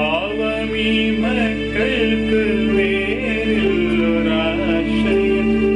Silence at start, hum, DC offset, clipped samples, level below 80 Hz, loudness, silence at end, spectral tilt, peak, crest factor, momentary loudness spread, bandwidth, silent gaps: 0 s; none; under 0.1%; under 0.1%; -34 dBFS; -18 LUFS; 0 s; -6.5 dB/octave; -6 dBFS; 12 dB; 3 LU; 10 kHz; none